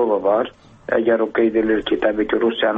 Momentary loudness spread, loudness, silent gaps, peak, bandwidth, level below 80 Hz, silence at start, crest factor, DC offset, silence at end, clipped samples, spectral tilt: 5 LU; -19 LUFS; none; -6 dBFS; 4.2 kHz; -50 dBFS; 0 s; 12 dB; under 0.1%; 0 s; under 0.1%; -7 dB/octave